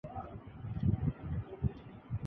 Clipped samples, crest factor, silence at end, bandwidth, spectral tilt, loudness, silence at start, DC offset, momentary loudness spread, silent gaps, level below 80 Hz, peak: under 0.1%; 18 dB; 0 s; 3.8 kHz; -11.5 dB/octave; -38 LUFS; 0.05 s; under 0.1%; 14 LU; none; -46 dBFS; -18 dBFS